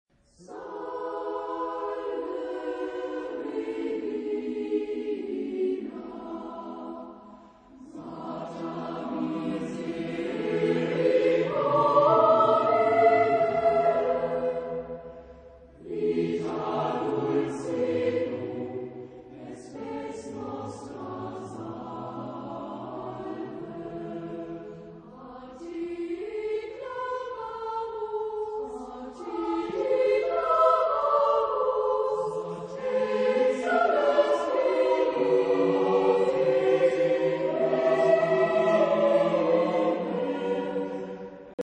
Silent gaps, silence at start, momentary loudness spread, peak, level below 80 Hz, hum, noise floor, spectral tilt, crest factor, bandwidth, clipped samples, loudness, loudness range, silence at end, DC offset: 41.54-41.58 s; 0.4 s; 16 LU; -10 dBFS; -64 dBFS; none; -51 dBFS; -6.5 dB/octave; 18 dB; 9.4 kHz; under 0.1%; -27 LUFS; 14 LU; 0.05 s; under 0.1%